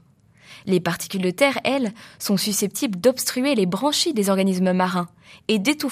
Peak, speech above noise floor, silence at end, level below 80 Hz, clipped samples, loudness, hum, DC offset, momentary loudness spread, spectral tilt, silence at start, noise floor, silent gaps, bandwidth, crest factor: -4 dBFS; 32 dB; 0 s; -66 dBFS; under 0.1%; -21 LUFS; none; under 0.1%; 7 LU; -4 dB/octave; 0.5 s; -53 dBFS; none; 15.5 kHz; 18 dB